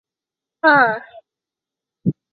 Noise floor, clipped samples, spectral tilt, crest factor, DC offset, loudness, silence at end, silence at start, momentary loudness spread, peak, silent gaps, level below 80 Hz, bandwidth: -88 dBFS; under 0.1%; -9.5 dB/octave; 20 dB; under 0.1%; -16 LUFS; 0.2 s; 0.65 s; 13 LU; -2 dBFS; none; -64 dBFS; 5 kHz